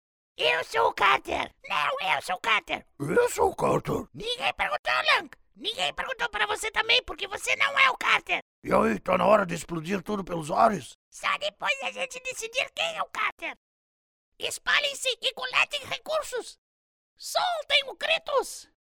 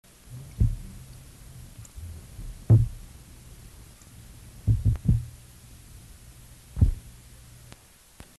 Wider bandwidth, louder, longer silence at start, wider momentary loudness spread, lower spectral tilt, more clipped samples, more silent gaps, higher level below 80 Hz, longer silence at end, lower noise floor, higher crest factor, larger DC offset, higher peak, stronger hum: first, 19 kHz vs 12.5 kHz; about the same, -26 LUFS vs -26 LUFS; about the same, 0.4 s vs 0.3 s; second, 10 LU vs 25 LU; second, -2.5 dB/octave vs -8 dB/octave; neither; first, 4.79-4.84 s, 8.42-8.62 s, 10.95-11.12 s, 13.32-13.38 s, 13.57-14.32 s, 16.58-17.16 s vs none; second, -56 dBFS vs -36 dBFS; second, 0.25 s vs 1.3 s; first, under -90 dBFS vs -52 dBFS; about the same, 24 dB vs 22 dB; neither; first, -4 dBFS vs -8 dBFS; neither